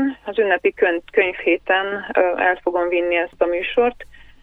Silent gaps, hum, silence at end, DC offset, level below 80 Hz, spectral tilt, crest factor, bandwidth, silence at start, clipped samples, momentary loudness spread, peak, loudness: none; none; 0.2 s; under 0.1%; -50 dBFS; -6 dB/octave; 16 dB; 4.6 kHz; 0 s; under 0.1%; 3 LU; -4 dBFS; -19 LUFS